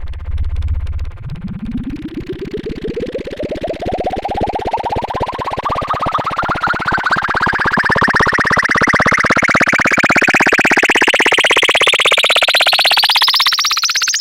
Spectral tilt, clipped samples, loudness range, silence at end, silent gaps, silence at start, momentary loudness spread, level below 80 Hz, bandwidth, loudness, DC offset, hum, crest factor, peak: -2.5 dB/octave; under 0.1%; 14 LU; 0 s; none; 0 s; 15 LU; -30 dBFS; 17 kHz; -12 LUFS; under 0.1%; none; 12 dB; -2 dBFS